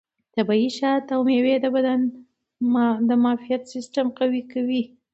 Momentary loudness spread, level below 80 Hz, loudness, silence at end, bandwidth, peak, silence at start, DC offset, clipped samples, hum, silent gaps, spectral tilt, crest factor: 8 LU; -74 dBFS; -22 LUFS; 0.3 s; 8.2 kHz; -8 dBFS; 0.35 s; under 0.1%; under 0.1%; none; none; -6 dB/octave; 14 dB